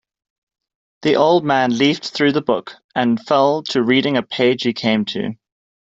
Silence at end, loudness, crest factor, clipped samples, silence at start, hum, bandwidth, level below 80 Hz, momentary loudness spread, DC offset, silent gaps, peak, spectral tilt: 0.5 s; -17 LUFS; 16 dB; under 0.1%; 1 s; none; 7.8 kHz; -60 dBFS; 9 LU; under 0.1%; 2.84-2.89 s; -2 dBFS; -5.5 dB/octave